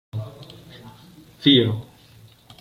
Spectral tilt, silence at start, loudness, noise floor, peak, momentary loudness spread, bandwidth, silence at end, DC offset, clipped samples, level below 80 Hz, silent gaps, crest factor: -7 dB/octave; 0.15 s; -19 LUFS; -50 dBFS; -4 dBFS; 27 LU; 15 kHz; 0.8 s; under 0.1%; under 0.1%; -58 dBFS; none; 22 dB